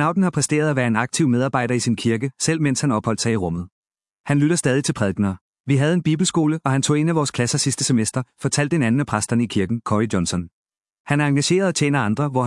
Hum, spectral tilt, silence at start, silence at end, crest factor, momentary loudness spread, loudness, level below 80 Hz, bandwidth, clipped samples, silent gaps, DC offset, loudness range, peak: none; -5 dB/octave; 0 s; 0 s; 18 dB; 6 LU; -20 LUFS; -56 dBFS; 12 kHz; under 0.1%; 3.72-3.83 s, 4.19-4.24 s, 5.41-5.53 s, 5.60-5.64 s, 10.53-10.65 s, 11.00-11.04 s; under 0.1%; 2 LU; -2 dBFS